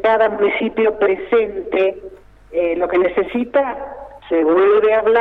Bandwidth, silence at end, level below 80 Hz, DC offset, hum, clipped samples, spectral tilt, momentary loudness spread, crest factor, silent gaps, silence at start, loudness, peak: 4.4 kHz; 0 s; -48 dBFS; under 0.1%; 50 Hz at -60 dBFS; under 0.1%; -7.5 dB/octave; 11 LU; 12 dB; none; 0 s; -17 LUFS; -4 dBFS